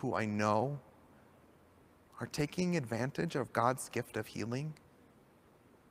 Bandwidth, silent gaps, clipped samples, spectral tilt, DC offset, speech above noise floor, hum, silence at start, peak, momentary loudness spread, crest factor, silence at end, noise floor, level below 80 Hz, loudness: 16 kHz; none; under 0.1%; -6 dB/octave; under 0.1%; 29 dB; none; 0 s; -14 dBFS; 12 LU; 24 dB; 1.15 s; -64 dBFS; -68 dBFS; -36 LUFS